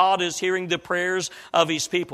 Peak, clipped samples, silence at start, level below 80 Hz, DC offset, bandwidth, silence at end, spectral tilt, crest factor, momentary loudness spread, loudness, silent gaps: -4 dBFS; under 0.1%; 0 s; -66 dBFS; under 0.1%; 15 kHz; 0 s; -3 dB/octave; 18 dB; 4 LU; -23 LUFS; none